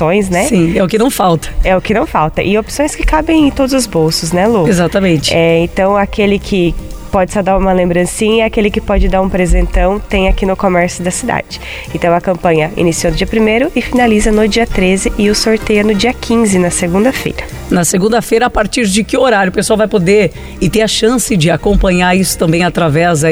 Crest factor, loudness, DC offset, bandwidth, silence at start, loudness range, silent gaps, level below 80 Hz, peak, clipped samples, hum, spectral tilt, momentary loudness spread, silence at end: 10 dB; -11 LUFS; under 0.1%; over 20 kHz; 0 s; 2 LU; none; -22 dBFS; 0 dBFS; under 0.1%; none; -5 dB/octave; 4 LU; 0 s